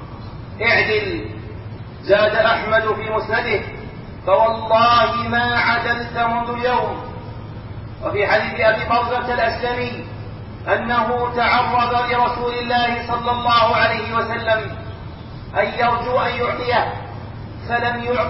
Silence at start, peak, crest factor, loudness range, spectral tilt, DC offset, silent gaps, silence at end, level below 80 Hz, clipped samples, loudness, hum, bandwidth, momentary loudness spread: 0 s; -4 dBFS; 16 dB; 3 LU; -2.5 dB/octave; under 0.1%; none; 0 s; -40 dBFS; under 0.1%; -18 LUFS; none; 5.8 kHz; 18 LU